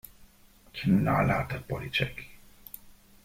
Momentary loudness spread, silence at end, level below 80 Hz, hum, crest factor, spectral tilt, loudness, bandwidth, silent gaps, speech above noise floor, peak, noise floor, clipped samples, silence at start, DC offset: 22 LU; 0.3 s; -50 dBFS; none; 18 dB; -7 dB/octave; -28 LUFS; 16.5 kHz; none; 30 dB; -12 dBFS; -57 dBFS; under 0.1%; 0.2 s; under 0.1%